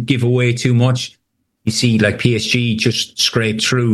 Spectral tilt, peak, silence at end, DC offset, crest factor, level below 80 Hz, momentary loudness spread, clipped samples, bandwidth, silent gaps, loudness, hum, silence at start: -5 dB/octave; -2 dBFS; 0 s; under 0.1%; 14 dB; -50 dBFS; 5 LU; under 0.1%; 12.5 kHz; none; -15 LUFS; none; 0 s